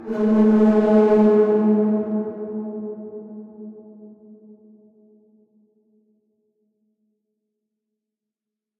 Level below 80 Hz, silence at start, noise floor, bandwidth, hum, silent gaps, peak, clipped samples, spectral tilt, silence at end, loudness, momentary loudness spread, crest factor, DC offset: -60 dBFS; 0 s; -87 dBFS; 4.7 kHz; none; none; -6 dBFS; under 0.1%; -10 dB/octave; 4.7 s; -18 LUFS; 23 LU; 16 dB; under 0.1%